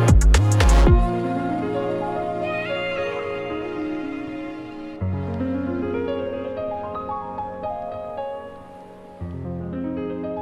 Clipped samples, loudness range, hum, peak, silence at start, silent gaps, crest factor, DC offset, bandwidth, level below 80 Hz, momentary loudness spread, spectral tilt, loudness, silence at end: under 0.1%; 10 LU; none; -4 dBFS; 0 s; none; 18 dB; under 0.1%; 12 kHz; -26 dBFS; 16 LU; -6.5 dB/octave; -24 LUFS; 0 s